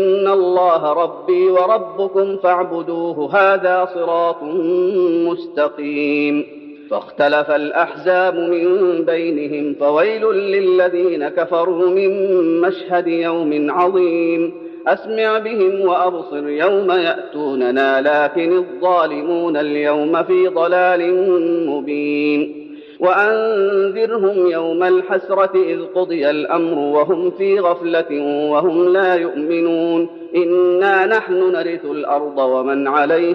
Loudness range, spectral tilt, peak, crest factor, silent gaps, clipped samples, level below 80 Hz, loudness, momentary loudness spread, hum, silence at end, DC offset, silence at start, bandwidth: 1 LU; -7.5 dB/octave; -2 dBFS; 14 dB; none; under 0.1%; -72 dBFS; -16 LUFS; 6 LU; none; 0 s; under 0.1%; 0 s; 5.4 kHz